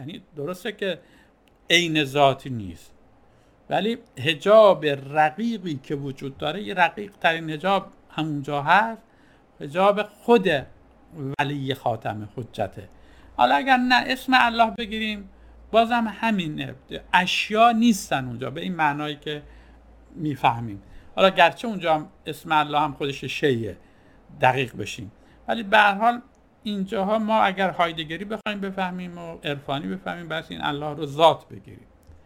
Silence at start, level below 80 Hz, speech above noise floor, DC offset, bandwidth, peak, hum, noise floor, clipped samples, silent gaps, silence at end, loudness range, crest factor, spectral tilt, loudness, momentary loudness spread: 0 s; -54 dBFS; 33 dB; under 0.1%; 17.5 kHz; -2 dBFS; none; -56 dBFS; under 0.1%; none; 0.5 s; 5 LU; 22 dB; -5 dB/octave; -23 LUFS; 16 LU